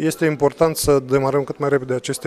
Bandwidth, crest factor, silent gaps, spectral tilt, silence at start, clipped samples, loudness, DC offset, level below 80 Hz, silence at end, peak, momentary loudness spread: 15.5 kHz; 16 dB; none; -5 dB/octave; 0 s; under 0.1%; -19 LUFS; under 0.1%; -44 dBFS; 0 s; -2 dBFS; 4 LU